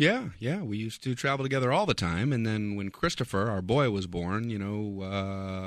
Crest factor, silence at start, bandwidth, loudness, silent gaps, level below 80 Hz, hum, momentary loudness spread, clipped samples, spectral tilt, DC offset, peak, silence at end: 20 dB; 0 s; 14 kHz; -30 LUFS; none; -54 dBFS; none; 7 LU; under 0.1%; -6 dB/octave; under 0.1%; -8 dBFS; 0 s